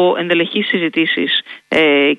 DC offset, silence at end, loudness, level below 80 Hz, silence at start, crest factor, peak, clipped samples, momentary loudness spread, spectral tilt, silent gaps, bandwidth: under 0.1%; 0 s; -15 LUFS; -60 dBFS; 0 s; 12 dB; -2 dBFS; under 0.1%; 5 LU; -6 dB/octave; none; 9.4 kHz